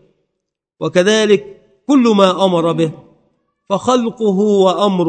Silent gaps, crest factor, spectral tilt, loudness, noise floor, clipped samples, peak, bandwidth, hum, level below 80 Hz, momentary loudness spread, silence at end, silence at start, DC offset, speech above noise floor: none; 14 dB; -5.5 dB/octave; -14 LUFS; -76 dBFS; under 0.1%; 0 dBFS; 9.2 kHz; none; -62 dBFS; 8 LU; 0 s; 0.8 s; under 0.1%; 63 dB